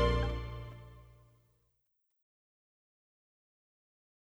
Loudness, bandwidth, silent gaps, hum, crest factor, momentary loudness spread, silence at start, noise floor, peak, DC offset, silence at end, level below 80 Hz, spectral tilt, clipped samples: -37 LUFS; 8.2 kHz; none; 50 Hz at -90 dBFS; 24 dB; 23 LU; 0 s; -80 dBFS; -16 dBFS; under 0.1%; 3.3 s; -44 dBFS; -7 dB/octave; under 0.1%